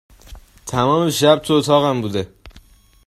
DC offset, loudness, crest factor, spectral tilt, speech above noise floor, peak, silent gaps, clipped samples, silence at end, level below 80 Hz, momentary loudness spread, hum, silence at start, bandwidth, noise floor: under 0.1%; -17 LUFS; 18 dB; -5 dB/octave; 32 dB; 0 dBFS; none; under 0.1%; 0.5 s; -46 dBFS; 12 LU; none; 0.3 s; 14.5 kHz; -48 dBFS